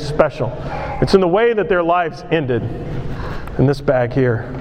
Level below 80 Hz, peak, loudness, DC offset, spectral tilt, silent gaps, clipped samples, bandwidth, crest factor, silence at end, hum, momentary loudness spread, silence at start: -34 dBFS; 0 dBFS; -18 LUFS; under 0.1%; -7.5 dB/octave; none; under 0.1%; 10 kHz; 16 dB; 0 s; none; 12 LU; 0 s